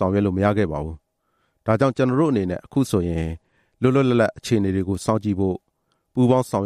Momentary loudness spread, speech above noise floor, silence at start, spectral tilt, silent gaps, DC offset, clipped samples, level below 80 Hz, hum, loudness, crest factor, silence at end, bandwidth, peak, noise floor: 11 LU; 50 dB; 0 s; -7.5 dB/octave; none; under 0.1%; under 0.1%; -48 dBFS; none; -21 LUFS; 18 dB; 0 s; 13.5 kHz; -4 dBFS; -70 dBFS